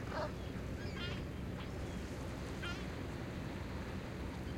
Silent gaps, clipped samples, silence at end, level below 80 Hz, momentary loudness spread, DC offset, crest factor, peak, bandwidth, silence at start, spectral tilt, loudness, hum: none; under 0.1%; 0 s; -50 dBFS; 2 LU; under 0.1%; 16 dB; -28 dBFS; 16.5 kHz; 0 s; -6 dB/octave; -44 LUFS; none